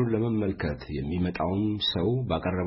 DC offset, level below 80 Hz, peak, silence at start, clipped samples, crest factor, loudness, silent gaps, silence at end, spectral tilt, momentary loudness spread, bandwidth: under 0.1%; -46 dBFS; -14 dBFS; 0 s; under 0.1%; 14 dB; -28 LUFS; none; 0 s; -10.5 dB/octave; 6 LU; 5.8 kHz